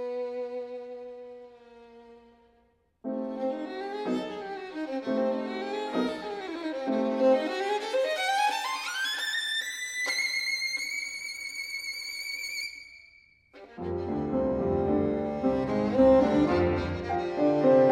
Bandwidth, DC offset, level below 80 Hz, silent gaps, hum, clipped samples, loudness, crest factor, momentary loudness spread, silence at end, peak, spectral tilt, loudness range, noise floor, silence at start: 16 kHz; under 0.1%; -54 dBFS; none; none; under 0.1%; -29 LUFS; 18 dB; 13 LU; 0 s; -10 dBFS; -4.5 dB/octave; 11 LU; -67 dBFS; 0 s